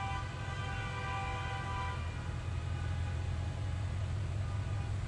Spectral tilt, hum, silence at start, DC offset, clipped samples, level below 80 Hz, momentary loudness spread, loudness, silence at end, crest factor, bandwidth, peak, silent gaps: -6 dB/octave; none; 0 s; under 0.1%; under 0.1%; -46 dBFS; 2 LU; -38 LUFS; 0 s; 12 dB; 11 kHz; -26 dBFS; none